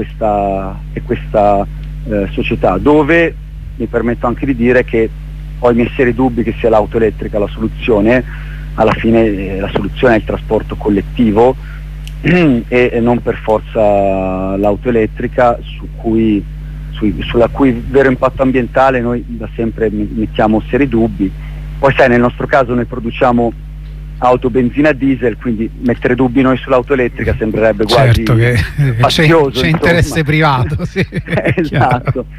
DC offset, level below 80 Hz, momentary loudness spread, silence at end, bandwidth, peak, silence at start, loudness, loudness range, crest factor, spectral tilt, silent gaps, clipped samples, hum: under 0.1%; -26 dBFS; 10 LU; 0 s; 15 kHz; 0 dBFS; 0 s; -13 LUFS; 3 LU; 12 dB; -7 dB/octave; none; under 0.1%; none